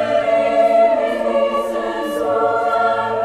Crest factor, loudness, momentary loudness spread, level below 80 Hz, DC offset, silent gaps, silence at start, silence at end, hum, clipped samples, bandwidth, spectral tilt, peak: 12 dB; -17 LUFS; 7 LU; -52 dBFS; under 0.1%; none; 0 s; 0 s; none; under 0.1%; 13.5 kHz; -5 dB/octave; -4 dBFS